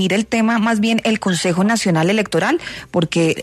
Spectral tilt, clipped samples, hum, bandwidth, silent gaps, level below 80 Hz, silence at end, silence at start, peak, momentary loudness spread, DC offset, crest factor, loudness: -5 dB/octave; under 0.1%; none; 13.5 kHz; none; -52 dBFS; 0 s; 0 s; -4 dBFS; 4 LU; under 0.1%; 12 dB; -17 LUFS